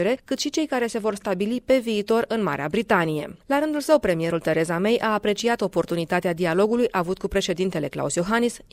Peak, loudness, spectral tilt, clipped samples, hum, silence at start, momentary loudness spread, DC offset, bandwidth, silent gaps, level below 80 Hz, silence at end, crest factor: -6 dBFS; -23 LUFS; -5 dB/octave; under 0.1%; none; 0 s; 5 LU; under 0.1%; 16 kHz; none; -50 dBFS; 0.15 s; 18 dB